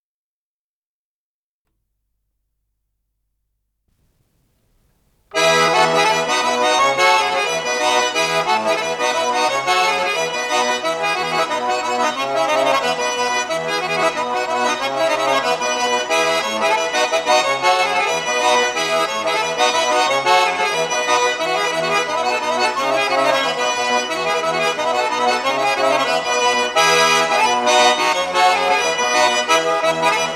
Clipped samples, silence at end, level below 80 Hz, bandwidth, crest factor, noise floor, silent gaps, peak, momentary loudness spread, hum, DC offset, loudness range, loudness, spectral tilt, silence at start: under 0.1%; 0 s; -62 dBFS; 15.5 kHz; 16 dB; under -90 dBFS; none; -2 dBFS; 5 LU; none; under 0.1%; 4 LU; -16 LUFS; -1 dB/octave; 5.35 s